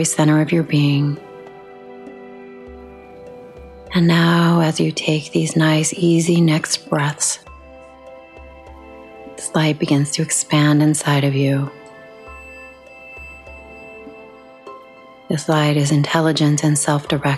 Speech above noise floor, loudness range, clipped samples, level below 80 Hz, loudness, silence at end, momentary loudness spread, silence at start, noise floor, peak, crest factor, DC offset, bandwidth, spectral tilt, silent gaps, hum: 26 dB; 11 LU; under 0.1%; -50 dBFS; -17 LUFS; 0 s; 24 LU; 0 s; -42 dBFS; -2 dBFS; 18 dB; under 0.1%; 13 kHz; -5 dB/octave; none; none